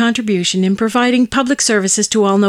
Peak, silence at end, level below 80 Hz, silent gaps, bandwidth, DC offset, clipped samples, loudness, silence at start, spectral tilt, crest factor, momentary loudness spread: -2 dBFS; 0 s; -50 dBFS; none; 14.5 kHz; under 0.1%; under 0.1%; -14 LUFS; 0 s; -3.5 dB/octave; 10 dB; 2 LU